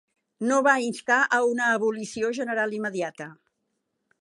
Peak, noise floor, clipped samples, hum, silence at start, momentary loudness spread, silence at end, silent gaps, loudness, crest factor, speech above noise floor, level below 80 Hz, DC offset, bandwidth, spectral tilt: -6 dBFS; -78 dBFS; under 0.1%; none; 0.4 s; 11 LU; 0.85 s; none; -24 LUFS; 20 dB; 53 dB; -76 dBFS; under 0.1%; 11.5 kHz; -3.5 dB/octave